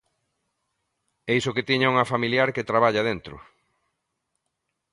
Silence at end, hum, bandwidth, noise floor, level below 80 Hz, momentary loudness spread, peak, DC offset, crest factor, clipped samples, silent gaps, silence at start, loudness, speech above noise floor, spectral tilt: 1.55 s; none; 11.5 kHz; -79 dBFS; -60 dBFS; 12 LU; -6 dBFS; under 0.1%; 20 dB; under 0.1%; none; 1.25 s; -22 LUFS; 56 dB; -5.5 dB/octave